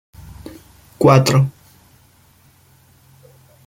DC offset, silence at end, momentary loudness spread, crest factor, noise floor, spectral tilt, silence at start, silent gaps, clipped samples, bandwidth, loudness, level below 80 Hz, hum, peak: under 0.1%; 2.15 s; 26 LU; 18 dB; -52 dBFS; -6 dB/octave; 0.45 s; none; under 0.1%; 16 kHz; -14 LUFS; -50 dBFS; none; -2 dBFS